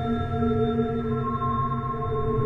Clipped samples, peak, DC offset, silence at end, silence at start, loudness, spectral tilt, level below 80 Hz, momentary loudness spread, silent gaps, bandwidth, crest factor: under 0.1%; -12 dBFS; under 0.1%; 0 s; 0 s; -26 LUFS; -10 dB/octave; -40 dBFS; 3 LU; none; 4.5 kHz; 12 dB